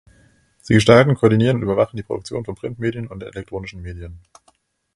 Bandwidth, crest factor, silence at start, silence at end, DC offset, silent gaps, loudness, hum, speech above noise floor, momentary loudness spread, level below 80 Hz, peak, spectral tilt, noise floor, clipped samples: 11.5 kHz; 20 dB; 0.7 s; 0.8 s; under 0.1%; none; -17 LUFS; none; 43 dB; 21 LU; -44 dBFS; 0 dBFS; -6.5 dB/octave; -61 dBFS; under 0.1%